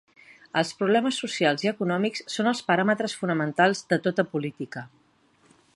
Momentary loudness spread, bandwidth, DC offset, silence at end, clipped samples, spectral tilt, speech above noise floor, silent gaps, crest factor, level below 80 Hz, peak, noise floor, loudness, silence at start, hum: 8 LU; 11.5 kHz; under 0.1%; 0.9 s; under 0.1%; -5 dB/octave; 37 dB; none; 20 dB; -74 dBFS; -6 dBFS; -62 dBFS; -25 LUFS; 0.55 s; none